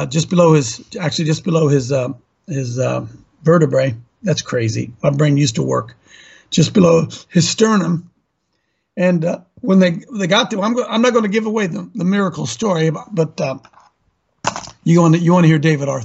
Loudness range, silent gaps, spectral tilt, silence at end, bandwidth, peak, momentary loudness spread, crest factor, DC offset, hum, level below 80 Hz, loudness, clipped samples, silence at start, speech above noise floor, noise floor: 2 LU; none; -6 dB/octave; 0 s; 8.2 kHz; 0 dBFS; 12 LU; 16 dB; under 0.1%; none; -54 dBFS; -16 LUFS; under 0.1%; 0 s; 53 dB; -68 dBFS